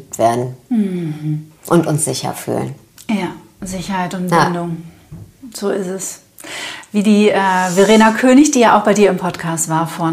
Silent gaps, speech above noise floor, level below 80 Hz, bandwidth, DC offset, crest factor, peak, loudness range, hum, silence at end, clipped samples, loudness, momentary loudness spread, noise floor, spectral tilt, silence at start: none; 23 dB; -50 dBFS; 15.5 kHz; under 0.1%; 14 dB; 0 dBFS; 9 LU; none; 0 s; under 0.1%; -15 LUFS; 16 LU; -37 dBFS; -5 dB/octave; 0 s